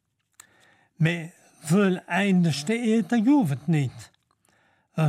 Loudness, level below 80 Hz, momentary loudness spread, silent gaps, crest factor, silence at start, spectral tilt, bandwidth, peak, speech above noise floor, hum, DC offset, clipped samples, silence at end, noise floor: -24 LUFS; -70 dBFS; 12 LU; none; 16 dB; 1 s; -6.5 dB/octave; 14.5 kHz; -10 dBFS; 43 dB; none; under 0.1%; under 0.1%; 0 s; -66 dBFS